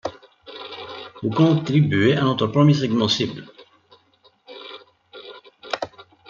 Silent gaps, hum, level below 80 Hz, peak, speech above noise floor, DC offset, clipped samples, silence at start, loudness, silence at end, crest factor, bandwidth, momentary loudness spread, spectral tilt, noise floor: none; none; -62 dBFS; -4 dBFS; 40 dB; under 0.1%; under 0.1%; 0.05 s; -20 LUFS; 0.25 s; 18 dB; 7.2 kHz; 23 LU; -6.5 dB/octave; -59 dBFS